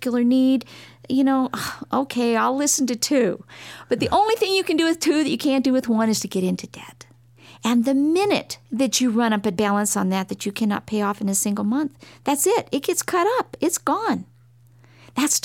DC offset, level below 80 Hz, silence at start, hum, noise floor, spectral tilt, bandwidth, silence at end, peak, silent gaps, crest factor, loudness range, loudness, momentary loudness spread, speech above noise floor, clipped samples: under 0.1%; -60 dBFS; 0 s; none; -52 dBFS; -3.5 dB/octave; 17 kHz; 0.05 s; -6 dBFS; none; 14 dB; 2 LU; -21 LUFS; 9 LU; 31 dB; under 0.1%